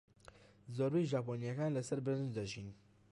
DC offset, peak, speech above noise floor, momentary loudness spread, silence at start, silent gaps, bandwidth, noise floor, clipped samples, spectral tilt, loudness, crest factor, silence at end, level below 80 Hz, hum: under 0.1%; -26 dBFS; 24 dB; 12 LU; 0.65 s; none; 11.5 kHz; -62 dBFS; under 0.1%; -7 dB/octave; -39 LUFS; 14 dB; 0.35 s; -70 dBFS; none